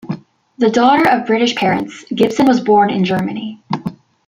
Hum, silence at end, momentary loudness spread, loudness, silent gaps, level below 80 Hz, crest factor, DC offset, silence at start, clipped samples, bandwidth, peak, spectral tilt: none; 0.35 s; 14 LU; -14 LUFS; none; -54 dBFS; 14 dB; under 0.1%; 0.05 s; under 0.1%; 15 kHz; 0 dBFS; -6 dB/octave